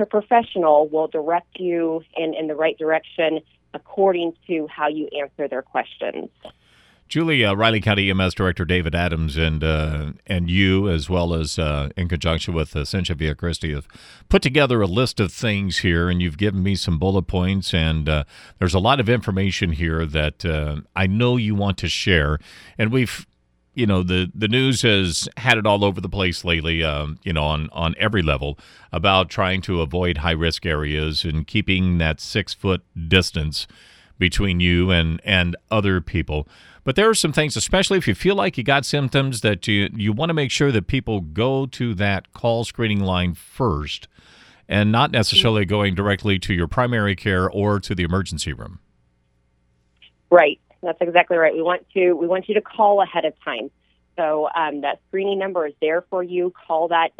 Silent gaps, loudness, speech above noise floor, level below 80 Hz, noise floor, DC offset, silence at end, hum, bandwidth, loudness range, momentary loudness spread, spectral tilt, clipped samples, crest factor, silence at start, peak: none; -20 LUFS; 44 dB; -36 dBFS; -64 dBFS; under 0.1%; 0.1 s; none; 14 kHz; 4 LU; 9 LU; -5.5 dB/octave; under 0.1%; 20 dB; 0 s; 0 dBFS